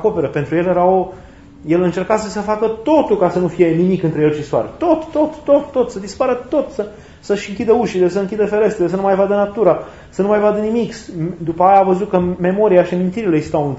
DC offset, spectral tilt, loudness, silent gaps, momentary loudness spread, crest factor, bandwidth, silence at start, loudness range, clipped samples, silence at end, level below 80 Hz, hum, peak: 0.2%; -7.5 dB/octave; -16 LUFS; none; 8 LU; 16 dB; 8 kHz; 0 s; 2 LU; under 0.1%; 0 s; -46 dBFS; none; 0 dBFS